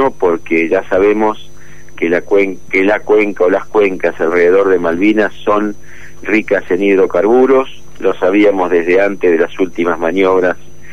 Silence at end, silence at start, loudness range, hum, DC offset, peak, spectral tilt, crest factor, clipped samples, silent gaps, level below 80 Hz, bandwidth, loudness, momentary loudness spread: 0 s; 0 s; 2 LU; none; 6%; -2 dBFS; -6 dB/octave; 10 dB; under 0.1%; none; -46 dBFS; 7.8 kHz; -12 LUFS; 7 LU